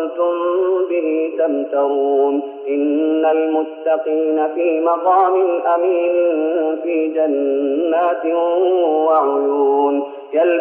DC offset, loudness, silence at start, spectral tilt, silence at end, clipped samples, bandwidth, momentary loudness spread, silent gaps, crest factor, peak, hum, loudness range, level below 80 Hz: under 0.1%; -17 LUFS; 0 s; -1.5 dB/octave; 0 s; under 0.1%; 3.5 kHz; 5 LU; none; 12 dB; -4 dBFS; none; 1 LU; -84 dBFS